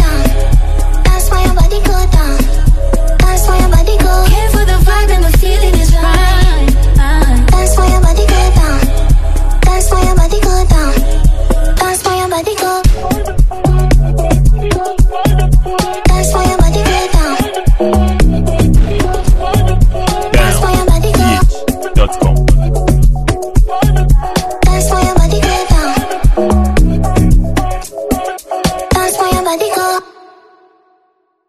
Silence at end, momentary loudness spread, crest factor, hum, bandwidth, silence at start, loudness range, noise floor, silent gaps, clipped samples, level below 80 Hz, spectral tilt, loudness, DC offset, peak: 1.45 s; 4 LU; 8 dB; none; 14 kHz; 0 s; 3 LU; -58 dBFS; none; 0.1%; -10 dBFS; -5.5 dB/octave; -12 LUFS; 1%; 0 dBFS